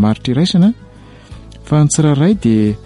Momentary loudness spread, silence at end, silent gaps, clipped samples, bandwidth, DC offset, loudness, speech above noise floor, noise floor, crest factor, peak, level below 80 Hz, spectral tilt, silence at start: 4 LU; 0.1 s; none; under 0.1%; 11.5 kHz; under 0.1%; -13 LUFS; 24 dB; -36 dBFS; 10 dB; -2 dBFS; -38 dBFS; -6 dB/octave; 0 s